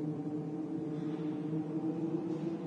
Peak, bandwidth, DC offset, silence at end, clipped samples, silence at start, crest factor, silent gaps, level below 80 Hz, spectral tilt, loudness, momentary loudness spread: -24 dBFS; 7.4 kHz; under 0.1%; 0 s; under 0.1%; 0 s; 14 dB; none; -78 dBFS; -9.5 dB/octave; -37 LUFS; 3 LU